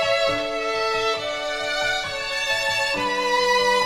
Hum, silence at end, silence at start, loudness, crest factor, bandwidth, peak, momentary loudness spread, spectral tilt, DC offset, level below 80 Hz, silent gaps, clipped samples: none; 0 s; 0 s; -22 LUFS; 14 dB; 17 kHz; -8 dBFS; 6 LU; -1.5 dB/octave; under 0.1%; -48 dBFS; none; under 0.1%